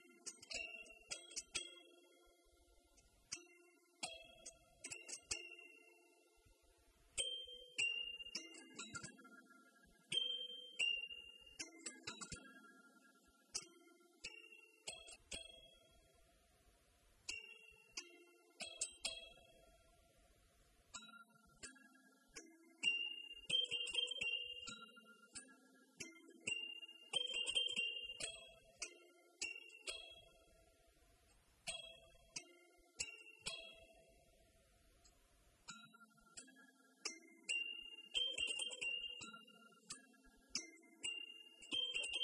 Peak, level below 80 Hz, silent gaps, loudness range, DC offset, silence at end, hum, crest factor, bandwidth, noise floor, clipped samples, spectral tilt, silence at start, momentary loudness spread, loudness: -26 dBFS; -78 dBFS; none; 12 LU; under 0.1%; 0 s; none; 24 dB; 12 kHz; -73 dBFS; under 0.1%; 0.5 dB/octave; 0 s; 22 LU; -45 LUFS